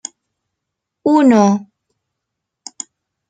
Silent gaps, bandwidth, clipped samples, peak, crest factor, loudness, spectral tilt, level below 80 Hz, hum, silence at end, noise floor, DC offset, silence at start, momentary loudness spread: none; 9.4 kHz; under 0.1%; -2 dBFS; 16 dB; -13 LUFS; -6 dB/octave; -64 dBFS; none; 1.65 s; -79 dBFS; under 0.1%; 1.05 s; 21 LU